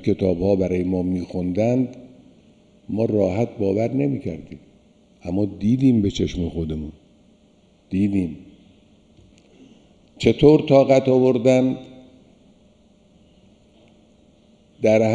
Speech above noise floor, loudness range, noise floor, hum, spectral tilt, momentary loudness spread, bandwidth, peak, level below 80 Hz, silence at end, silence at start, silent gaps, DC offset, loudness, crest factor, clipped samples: 37 dB; 10 LU; -56 dBFS; none; -7.5 dB/octave; 15 LU; 9.8 kHz; -2 dBFS; -46 dBFS; 0 s; 0 s; none; under 0.1%; -20 LUFS; 20 dB; under 0.1%